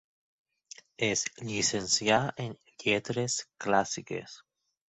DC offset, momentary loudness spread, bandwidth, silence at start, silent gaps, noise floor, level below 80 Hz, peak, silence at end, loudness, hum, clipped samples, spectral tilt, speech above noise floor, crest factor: under 0.1%; 16 LU; 8.4 kHz; 1 s; none; -54 dBFS; -66 dBFS; -10 dBFS; 0.5 s; -30 LUFS; none; under 0.1%; -3 dB/octave; 23 dB; 22 dB